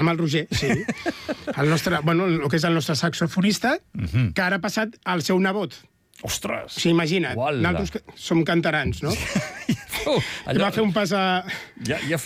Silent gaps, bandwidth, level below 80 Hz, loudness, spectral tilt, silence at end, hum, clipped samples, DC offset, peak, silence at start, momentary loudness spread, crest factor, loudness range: none; 16 kHz; -46 dBFS; -23 LUFS; -5 dB/octave; 0 s; none; under 0.1%; under 0.1%; -10 dBFS; 0 s; 8 LU; 12 dB; 2 LU